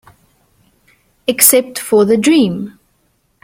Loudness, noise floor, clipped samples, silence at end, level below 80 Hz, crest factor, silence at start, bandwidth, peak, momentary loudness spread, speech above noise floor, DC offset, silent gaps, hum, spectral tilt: -11 LUFS; -60 dBFS; 0.1%; 0.75 s; -56 dBFS; 16 dB; 1.3 s; 16.5 kHz; 0 dBFS; 15 LU; 49 dB; under 0.1%; none; none; -3.5 dB/octave